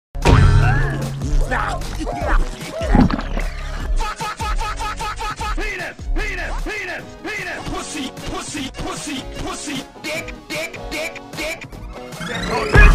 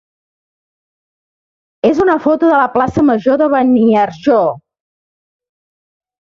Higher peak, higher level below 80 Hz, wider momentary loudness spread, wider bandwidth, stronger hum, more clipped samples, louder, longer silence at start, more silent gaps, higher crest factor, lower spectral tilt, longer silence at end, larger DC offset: about the same, 0 dBFS vs 0 dBFS; first, -22 dBFS vs -50 dBFS; first, 12 LU vs 4 LU; first, 15 kHz vs 7.2 kHz; neither; neither; second, -22 LUFS vs -12 LUFS; second, 0.15 s vs 1.85 s; neither; first, 20 dB vs 14 dB; second, -5 dB/octave vs -7.5 dB/octave; second, 0 s vs 1.7 s; neither